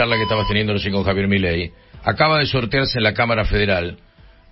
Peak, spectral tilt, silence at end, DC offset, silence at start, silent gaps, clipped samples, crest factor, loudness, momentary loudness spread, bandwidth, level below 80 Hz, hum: -2 dBFS; -9.5 dB/octave; 0.55 s; under 0.1%; 0 s; none; under 0.1%; 18 dB; -18 LUFS; 8 LU; 5.8 kHz; -34 dBFS; none